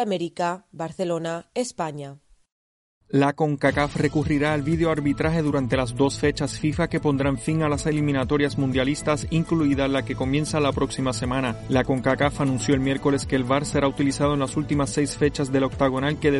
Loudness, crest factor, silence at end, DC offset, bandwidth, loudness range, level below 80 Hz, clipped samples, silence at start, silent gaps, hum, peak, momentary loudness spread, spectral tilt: -23 LUFS; 16 dB; 0 s; under 0.1%; 11.5 kHz; 3 LU; -42 dBFS; under 0.1%; 0 s; 2.52-3.01 s; none; -6 dBFS; 5 LU; -6 dB/octave